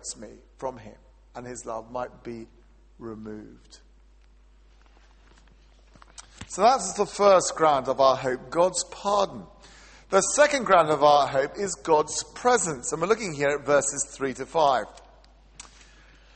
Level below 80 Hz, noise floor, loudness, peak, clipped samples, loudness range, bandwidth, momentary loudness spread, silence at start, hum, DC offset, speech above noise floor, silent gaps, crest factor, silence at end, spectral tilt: -54 dBFS; -55 dBFS; -23 LUFS; -6 dBFS; under 0.1%; 17 LU; 8.8 kHz; 21 LU; 0.05 s; none; under 0.1%; 31 dB; none; 20 dB; 1.4 s; -3 dB/octave